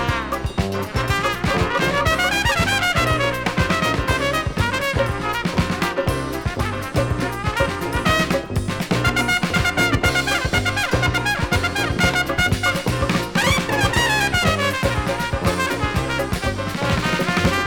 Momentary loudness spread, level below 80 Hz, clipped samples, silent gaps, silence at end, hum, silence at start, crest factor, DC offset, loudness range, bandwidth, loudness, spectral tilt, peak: 6 LU; -32 dBFS; under 0.1%; none; 0 s; none; 0 s; 18 dB; under 0.1%; 3 LU; 17.5 kHz; -20 LUFS; -4.5 dB/octave; -2 dBFS